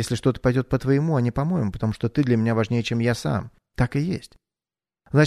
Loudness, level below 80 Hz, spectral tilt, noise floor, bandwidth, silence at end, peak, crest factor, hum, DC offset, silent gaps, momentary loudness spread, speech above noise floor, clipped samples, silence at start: -23 LUFS; -44 dBFS; -7 dB/octave; under -90 dBFS; 13.5 kHz; 0 s; -4 dBFS; 20 dB; none; under 0.1%; none; 6 LU; over 68 dB; under 0.1%; 0 s